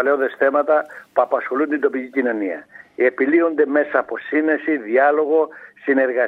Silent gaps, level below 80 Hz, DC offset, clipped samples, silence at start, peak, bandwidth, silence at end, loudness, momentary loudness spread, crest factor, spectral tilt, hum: none; -74 dBFS; under 0.1%; under 0.1%; 0 s; -2 dBFS; 4.4 kHz; 0 s; -19 LUFS; 8 LU; 16 dB; -7 dB/octave; none